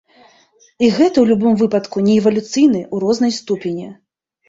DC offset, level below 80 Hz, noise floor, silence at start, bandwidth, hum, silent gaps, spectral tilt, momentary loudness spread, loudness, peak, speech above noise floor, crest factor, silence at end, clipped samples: under 0.1%; -56 dBFS; -53 dBFS; 0.8 s; 7.8 kHz; none; none; -6 dB/octave; 9 LU; -15 LUFS; -2 dBFS; 38 dB; 14 dB; 0.55 s; under 0.1%